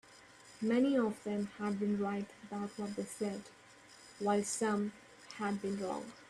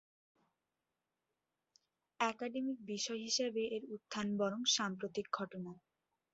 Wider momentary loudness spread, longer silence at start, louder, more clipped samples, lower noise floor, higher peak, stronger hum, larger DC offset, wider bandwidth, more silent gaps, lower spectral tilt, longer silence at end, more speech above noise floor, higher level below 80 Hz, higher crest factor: first, 23 LU vs 11 LU; second, 0.1 s vs 2.2 s; about the same, -37 LUFS vs -38 LUFS; neither; second, -59 dBFS vs -90 dBFS; about the same, -20 dBFS vs -18 dBFS; neither; neither; first, 12.5 kHz vs 8 kHz; neither; first, -5 dB/octave vs -2.5 dB/octave; second, 0.05 s vs 0.55 s; second, 23 dB vs 51 dB; first, -76 dBFS vs -82 dBFS; about the same, 18 dB vs 22 dB